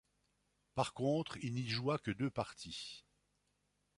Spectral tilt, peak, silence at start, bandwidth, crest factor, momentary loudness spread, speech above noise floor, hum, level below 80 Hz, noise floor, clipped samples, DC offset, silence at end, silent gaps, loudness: -5.5 dB/octave; -20 dBFS; 0.75 s; 11.5 kHz; 22 dB; 9 LU; 42 dB; 50 Hz at -65 dBFS; -70 dBFS; -81 dBFS; under 0.1%; under 0.1%; 1 s; none; -40 LUFS